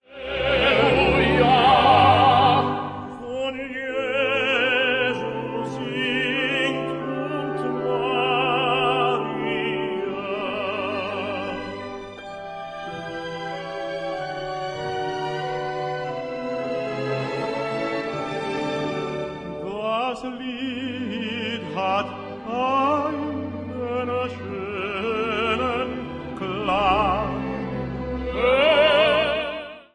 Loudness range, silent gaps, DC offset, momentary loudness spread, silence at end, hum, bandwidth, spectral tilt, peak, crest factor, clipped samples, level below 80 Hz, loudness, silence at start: 10 LU; none; under 0.1%; 14 LU; 0.1 s; none; 10 kHz; -6 dB/octave; -4 dBFS; 20 dB; under 0.1%; -46 dBFS; -23 LUFS; 0.1 s